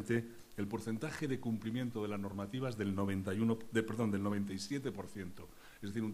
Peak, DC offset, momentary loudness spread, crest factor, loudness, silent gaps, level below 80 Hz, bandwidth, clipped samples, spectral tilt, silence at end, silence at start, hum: -20 dBFS; under 0.1%; 12 LU; 18 dB; -39 LUFS; none; -68 dBFS; 15.5 kHz; under 0.1%; -6.5 dB/octave; 0 s; 0 s; none